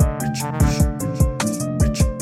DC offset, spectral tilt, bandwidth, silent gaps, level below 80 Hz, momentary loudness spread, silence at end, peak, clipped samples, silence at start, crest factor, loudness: under 0.1%; -6 dB/octave; 15.5 kHz; none; -24 dBFS; 5 LU; 0 s; -4 dBFS; under 0.1%; 0 s; 14 dB; -20 LUFS